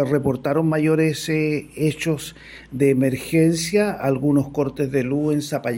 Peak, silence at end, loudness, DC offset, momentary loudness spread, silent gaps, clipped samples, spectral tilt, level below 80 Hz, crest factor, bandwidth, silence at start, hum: -6 dBFS; 0 s; -21 LUFS; under 0.1%; 6 LU; none; under 0.1%; -6 dB/octave; -52 dBFS; 16 dB; 16.5 kHz; 0 s; none